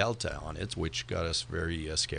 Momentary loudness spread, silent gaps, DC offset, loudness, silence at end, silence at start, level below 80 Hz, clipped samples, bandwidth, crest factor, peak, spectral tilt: 6 LU; none; under 0.1%; -33 LUFS; 0 s; 0 s; -44 dBFS; under 0.1%; 10 kHz; 22 dB; -12 dBFS; -3.5 dB/octave